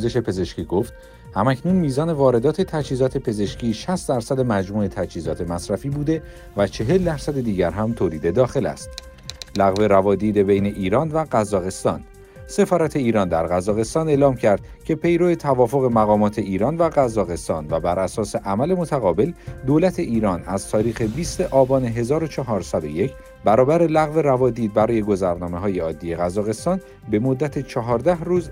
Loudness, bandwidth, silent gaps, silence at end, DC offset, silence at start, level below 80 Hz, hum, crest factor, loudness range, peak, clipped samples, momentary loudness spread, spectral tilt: -21 LUFS; 16 kHz; none; 0 s; under 0.1%; 0 s; -42 dBFS; none; 16 dB; 4 LU; -4 dBFS; under 0.1%; 8 LU; -7 dB/octave